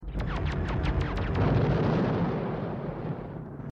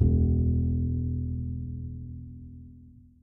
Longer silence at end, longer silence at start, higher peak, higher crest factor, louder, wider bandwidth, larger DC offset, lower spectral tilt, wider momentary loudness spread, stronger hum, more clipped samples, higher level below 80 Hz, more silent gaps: second, 0 s vs 0.3 s; about the same, 0 s vs 0 s; second, -14 dBFS vs -10 dBFS; about the same, 14 dB vs 18 dB; about the same, -29 LUFS vs -29 LUFS; first, 7.6 kHz vs 0.9 kHz; neither; second, -8.5 dB/octave vs -18 dB/octave; second, 10 LU vs 21 LU; neither; neither; about the same, -36 dBFS vs -34 dBFS; neither